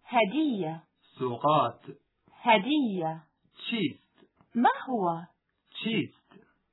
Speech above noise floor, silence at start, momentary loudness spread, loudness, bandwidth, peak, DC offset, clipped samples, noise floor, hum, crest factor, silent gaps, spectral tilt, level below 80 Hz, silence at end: 36 dB; 0.1 s; 15 LU; -29 LUFS; 4.1 kHz; -10 dBFS; under 0.1%; under 0.1%; -64 dBFS; none; 20 dB; none; -9 dB/octave; -82 dBFS; 0.65 s